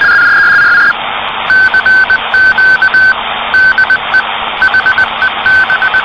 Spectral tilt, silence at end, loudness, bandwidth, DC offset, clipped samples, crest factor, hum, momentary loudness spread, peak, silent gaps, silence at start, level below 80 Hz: -2.5 dB/octave; 0 s; -7 LUFS; 8.8 kHz; under 0.1%; under 0.1%; 8 dB; none; 6 LU; 0 dBFS; none; 0 s; -40 dBFS